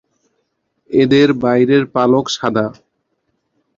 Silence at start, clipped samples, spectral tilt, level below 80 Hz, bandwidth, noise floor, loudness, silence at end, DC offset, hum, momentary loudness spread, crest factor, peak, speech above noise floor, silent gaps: 0.9 s; under 0.1%; -6 dB/octave; -54 dBFS; 7.6 kHz; -68 dBFS; -14 LUFS; 1.05 s; under 0.1%; none; 7 LU; 14 dB; -2 dBFS; 55 dB; none